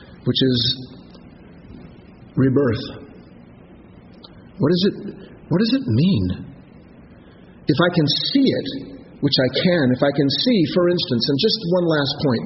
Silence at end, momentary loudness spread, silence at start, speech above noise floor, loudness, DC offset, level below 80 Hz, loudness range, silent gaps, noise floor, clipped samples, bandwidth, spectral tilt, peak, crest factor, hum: 0 s; 15 LU; 0 s; 26 dB; -19 LUFS; under 0.1%; -50 dBFS; 7 LU; none; -45 dBFS; under 0.1%; 6 kHz; -5 dB/octave; -2 dBFS; 18 dB; none